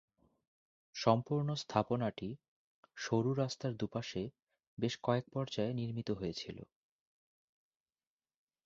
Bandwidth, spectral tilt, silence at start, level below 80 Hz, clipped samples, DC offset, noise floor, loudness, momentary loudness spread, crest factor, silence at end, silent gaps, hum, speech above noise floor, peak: 7.6 kHz; -6 dB/octave; 0.95 s; -68 dBFS; under 0.1%; under 0.1%; under -90 dBFS; -37 LUFS; 14 LU; 26 dB; 2 s; 2.48-2.83 s, 4.42-4.47 s, 4.67-4.77 s; none; over 54 dB; -12 dBFS